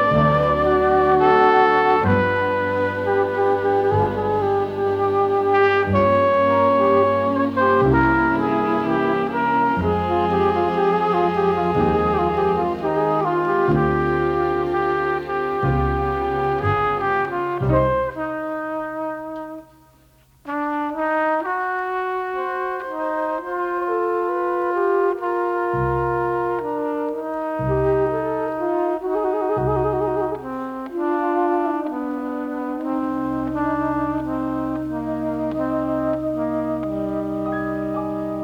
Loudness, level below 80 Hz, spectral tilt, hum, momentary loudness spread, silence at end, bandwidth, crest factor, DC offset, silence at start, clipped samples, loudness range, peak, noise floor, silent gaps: -20 LUFS; -40 dBFS; -8.5 dB/octave; none; 9 LU; 0 s; 7.2 kHz; 16 dB; under 0.1%; 0 s; under 0.1%; 7 LU; -4 dBFS; -54 dBFS; none